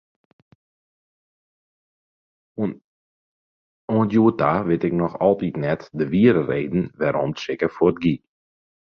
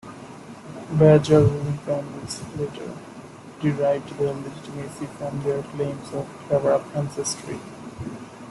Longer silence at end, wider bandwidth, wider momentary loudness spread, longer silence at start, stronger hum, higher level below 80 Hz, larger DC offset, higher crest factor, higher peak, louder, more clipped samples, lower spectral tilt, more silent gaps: first, 0.75 s vs 0 s; second, 6.8 kHz vs 12 kHz; second, 11 LU vs 21 LU; first, 2.6 s vs 0.05 s; neither; about the same, -54 dBFS vs -52 dBFS; neither; about the same, 20 dB vs 20 dB; about the same, -2 dBFS vs -4 dBFS; about the same, -21 LUFS vs -23 LUFS; neither; first, -8.5 dB/octave vs -6.5 dB/octave; first, 2.84-3.88 s vs none